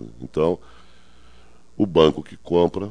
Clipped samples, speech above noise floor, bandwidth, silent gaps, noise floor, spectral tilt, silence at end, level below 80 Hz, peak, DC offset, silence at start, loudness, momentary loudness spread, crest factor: under 0.1%; 33 dB; 9.8 kHz; none; -53 dBFS; -7 dB/octave; 0 s; -48 dBFS; -2 dBFS; 0.7%; 0 s; -21 LUFS; 13 LU; 22 dB